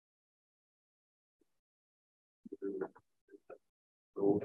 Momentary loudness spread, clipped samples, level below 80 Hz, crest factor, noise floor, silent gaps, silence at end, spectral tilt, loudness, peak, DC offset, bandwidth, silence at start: 23 LU; under 0.1%; -86 dBFS; 24 dB; under -90 dBFS; 3.21-3.28 s, 3.69-4.14 s; 0 s; -11 dB/octave; -40 LUFS; -20 dBFS; under 0.1%; 2.7 kHz; 2.45 s